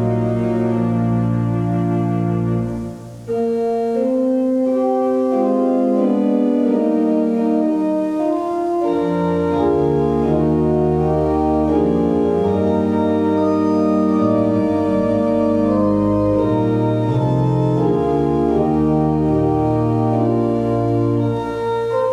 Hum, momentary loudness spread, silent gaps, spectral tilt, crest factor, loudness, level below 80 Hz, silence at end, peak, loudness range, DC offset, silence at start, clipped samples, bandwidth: none; 3 LU; none; -9.5 dB/octave; 12 dB; -17 LUFS; -40 dBFS; 0 s; -4 dBFS; 3 LU; under 0.1%; 0 s; under 0.1%; 9.8 kHz